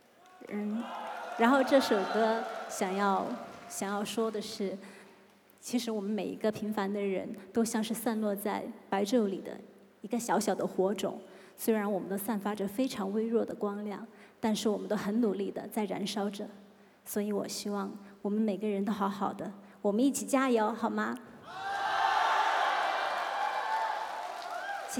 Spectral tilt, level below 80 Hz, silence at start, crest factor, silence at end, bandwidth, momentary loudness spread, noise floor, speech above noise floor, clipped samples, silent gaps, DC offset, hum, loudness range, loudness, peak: -4.5 dB/octave; -80 dBFS; 0.35 s; 20 dB; 0 s; 18.5 kHz; 13 LU; -60 dBFS; 29 dB; under 0.1%; none; under 0.1%; none; 5 LU; -32 LUFS; -12 dBFS